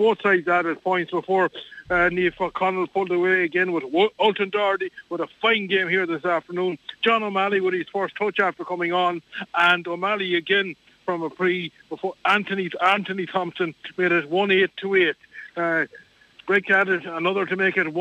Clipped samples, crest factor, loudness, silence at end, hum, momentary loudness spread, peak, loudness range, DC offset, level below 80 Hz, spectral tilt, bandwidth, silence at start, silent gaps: under 0.1%; 16 dB; -22 LUFS; 0 s; none; 9 LU; -8 dBFS; 2 LU; under 0.1%; -60 dBFS; -6 dB/octave; 8.4 kHz; 0 s; none